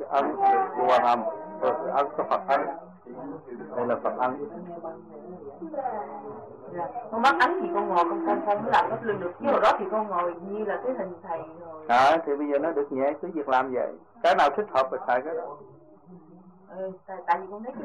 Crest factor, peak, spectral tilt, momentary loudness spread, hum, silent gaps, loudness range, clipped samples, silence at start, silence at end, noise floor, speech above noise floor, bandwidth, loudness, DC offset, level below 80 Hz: 16 dB; -10 dBFS; -5.5 dB/octave; 18 LU; none; none; 8 LU; under 0.1%; 0 s; 0 s; -51 dBFS; 25 dB; 11 kHz; -26 LUFS; under 0.1%; -68 dBFS